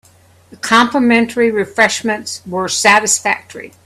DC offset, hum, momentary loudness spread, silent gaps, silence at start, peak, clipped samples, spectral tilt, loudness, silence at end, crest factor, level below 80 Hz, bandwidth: under 0.1%; none; 11 LU; none; 0.5 s; 0 dBFS; under 0.1%; -2.5 dB/octave; -13 LUFS; 0.15 s; 14 dB; -56 dBFS; 14.5 kHz